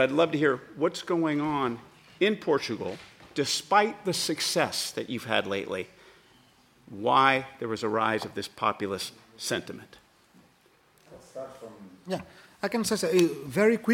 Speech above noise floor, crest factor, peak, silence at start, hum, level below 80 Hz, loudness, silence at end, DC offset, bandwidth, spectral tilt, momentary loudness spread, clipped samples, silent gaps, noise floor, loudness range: 35 dB; 22 dB; -6 dBFS; 0 s; none; -68 dBFS; -28 LUFS; 0 s; under 0.1%; 16.5 kHz; -4 dB/octave; 18 LU; under 0.1%; none; -62 dBFS; 10 LU